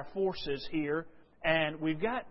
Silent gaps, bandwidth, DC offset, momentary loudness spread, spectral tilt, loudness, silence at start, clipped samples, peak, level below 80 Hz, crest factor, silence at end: none; 5.8 kHz; under 0.1%; 8 LU; -9 dB/octave; -33 LUFS; 0 s; under 0.1%; -14 dBFS; -56 dBFS; 18 dB; 0 s